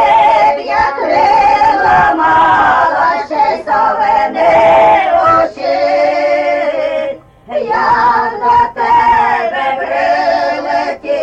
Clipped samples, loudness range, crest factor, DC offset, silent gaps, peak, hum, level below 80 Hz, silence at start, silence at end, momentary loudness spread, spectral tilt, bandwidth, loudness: under 0.1%; 3 LU; 10 dB; under 0.1%; none; 0 dBFS; none; -42 dBFS; 0 s; 0 s; 7 LU; -5 dB/octave; 8.4 kHz; -11 LUFS